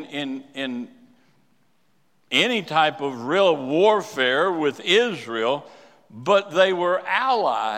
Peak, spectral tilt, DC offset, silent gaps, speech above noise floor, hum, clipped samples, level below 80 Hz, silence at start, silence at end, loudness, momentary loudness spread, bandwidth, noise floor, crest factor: -4 dBFS; -4 dB/octave; under 0.1%; none; 46 dB; none; under 0.1%; -80 dBFS; 0 s; 0 s; -21 LUFS; 11 LU; 15.5 kHz; -67 dBFS; 20 dB